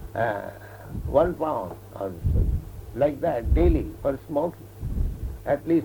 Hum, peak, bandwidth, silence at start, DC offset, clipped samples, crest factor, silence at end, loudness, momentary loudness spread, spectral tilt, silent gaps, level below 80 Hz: none; -6 dBFS; 19.5 kHz; 0 s; under 0.1%; under 0.1%; 18 dB; 0 s; -26 LUFS; 14 LU; -9 dB/octave; none; -30 dBFS